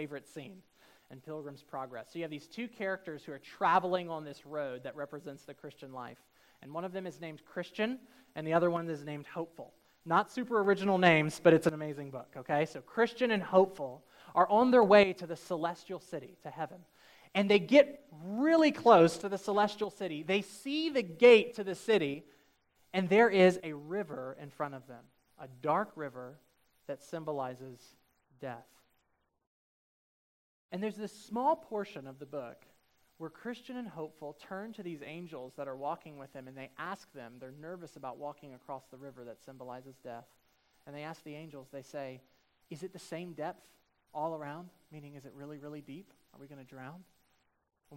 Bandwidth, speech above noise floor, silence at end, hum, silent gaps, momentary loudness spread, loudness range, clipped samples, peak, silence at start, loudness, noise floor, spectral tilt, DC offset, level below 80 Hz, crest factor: 16 kHz; 45 dB; 0 s; none; 29.47-30.69 s; 24 LU; 19 LU; under 0.1%; -8 dBFS; 0 s; -31 LUFS; -78 dBFS; -6 dB/octave; under 0.1%; -76 dBFS; 26 dB